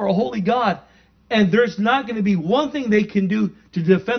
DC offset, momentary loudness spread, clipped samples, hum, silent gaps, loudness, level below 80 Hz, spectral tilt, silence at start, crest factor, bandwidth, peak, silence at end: under 0.1%; 6 LU; under 0.1%; none; none; -19 LUFS; -56 dBFS; -7 dB/octave; 0 s; 18 dB; 6.4 kHz; -2 dBFS; 0 s